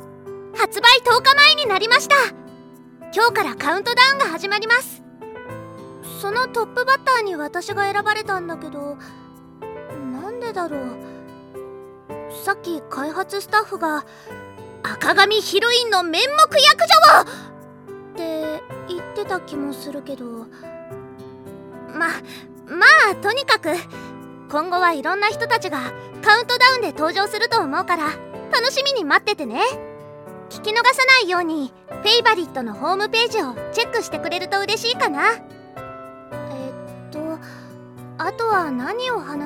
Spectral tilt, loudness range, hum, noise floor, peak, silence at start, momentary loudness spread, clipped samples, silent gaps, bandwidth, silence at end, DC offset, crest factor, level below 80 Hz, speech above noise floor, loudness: -2 dB/octave; 15 LU; none; -43 dBFS; 0 dBFS; 0 s; 25 LU; under 0.1%; none; 17.5 kHz; 0 s; under 0.1%; 20 dB; -62 dBFS; 25 dB; -17 LUFS